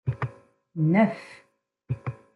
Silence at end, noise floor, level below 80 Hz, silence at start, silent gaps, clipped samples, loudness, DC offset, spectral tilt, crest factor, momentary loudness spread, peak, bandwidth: 0.2 s; -49 dBFS; -60 dBFS; 0.05 s; none; under 0.1%; -26 LUFS; under 0.1%; -9.5 dB/octave; 20 dB; 19 LU; -8 dBFS; 10 kHz